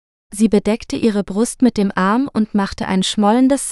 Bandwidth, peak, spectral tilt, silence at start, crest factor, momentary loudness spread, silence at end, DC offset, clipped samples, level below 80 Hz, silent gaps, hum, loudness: 12.5 kHz; -2 dBFS; -5 dB/octave; 0.3 s; 16 dB; 6 LU; 0 s; under 0.1%; under 0.1%; -44 dBFS; none; none; -17 LUFS